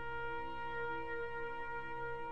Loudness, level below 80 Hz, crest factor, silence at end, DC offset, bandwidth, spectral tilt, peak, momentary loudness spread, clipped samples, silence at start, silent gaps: -43 LUFS; -60 dBFS; 10 dB; 0 s; 0.5%; 8.8 kHz; -6.5 dB/octave; -32 dBFS; 2 LU; under 0.1%; 0 s; none